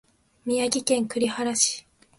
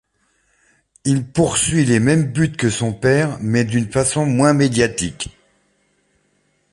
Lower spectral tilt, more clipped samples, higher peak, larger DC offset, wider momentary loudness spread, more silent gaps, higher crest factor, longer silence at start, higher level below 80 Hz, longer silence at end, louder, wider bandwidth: second, -2 dB/octave vs -5 dB/octave; neither; second, -6 dBFS vs -2 dBFS; neither; first, 10 LU vs 7 LU; neither; about the same, 20 dB vs 18 dB; second, 0.45 s vs 1.05 s; second, -66 dBFS vs -44 dBFS; second, 0.4 s vs 1.4 s; second, -24 LUFS vs -17 LUFS; about the same, 11.5 kHz vs 11.5 kHz